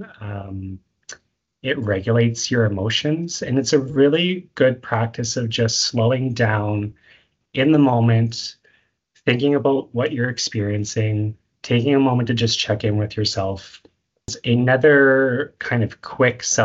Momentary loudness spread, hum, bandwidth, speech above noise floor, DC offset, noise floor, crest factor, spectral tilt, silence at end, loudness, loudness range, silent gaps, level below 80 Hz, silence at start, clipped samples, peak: 15 LU; none; 8 kHz; 43 dB; under 0.1%; -62 dBFS; 18 dB; -5 dB/octave; 0 s; -19 LUFS; 3 LU; none; -54 dBFS; 0 s; under 0.1%; -2 dBFS